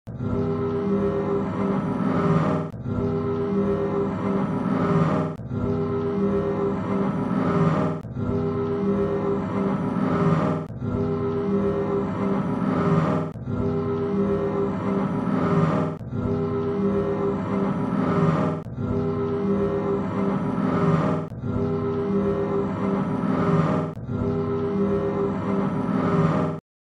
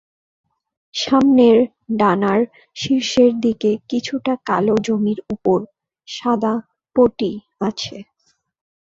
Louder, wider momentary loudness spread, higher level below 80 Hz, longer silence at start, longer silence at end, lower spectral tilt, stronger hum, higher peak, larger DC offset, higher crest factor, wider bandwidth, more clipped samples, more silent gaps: second, -24 LUFS vs -18 LUFS; second, 5 LU vs 12 LU; first, -46 dBFS vs -54 dBFS; second, 0.05 s vs 0.95 s; second, 0.25 s vs 0.8 s; first, -9.5 dB/octave vs -5.5 dB/octave; neither; second, -8 dBFS vs -2 dBFS; neither; about the same, 16 dB vs 16 dB; about the same, 7.8 kHz vs 7.8 kHz; neither; neither